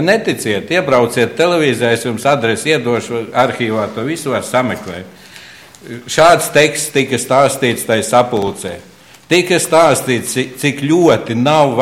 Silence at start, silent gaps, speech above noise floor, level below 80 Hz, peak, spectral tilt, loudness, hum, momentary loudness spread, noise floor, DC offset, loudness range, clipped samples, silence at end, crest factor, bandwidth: 0 s; none; 24 dB; -52 dBFS; 0 dBFS; -4 dB/octave; -13 LUFS; none; 10 LU; -37 dBFS; under 0.1%; 4 LU; under 0.1%; 0 s; 14 dB; 16.5 kHz